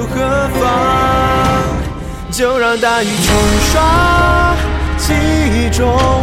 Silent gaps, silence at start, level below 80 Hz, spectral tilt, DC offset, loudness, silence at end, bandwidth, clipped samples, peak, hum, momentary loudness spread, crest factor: none; 0 s; -20 dBFS; -5 dB/octave; under 0.1%; -13 LUFS; 0 s; 16.5 kHz; under 0.1%; 0 dBFS; none; 6 LU; 12 dB